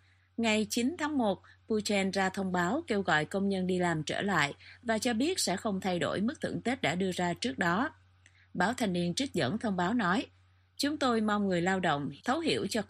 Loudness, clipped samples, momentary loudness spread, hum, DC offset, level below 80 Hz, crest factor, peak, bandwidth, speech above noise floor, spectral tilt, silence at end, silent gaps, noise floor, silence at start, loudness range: -31 LUFS; under 0.1%; 5 LU; none; under 0.1%; -68 dBFS; 18 dB; -12 dBFS; 15 kHz; 32 dB; -4.5 dB/octave; 0.05 s; none; -62 dBFS; 0.4 s; 2 LU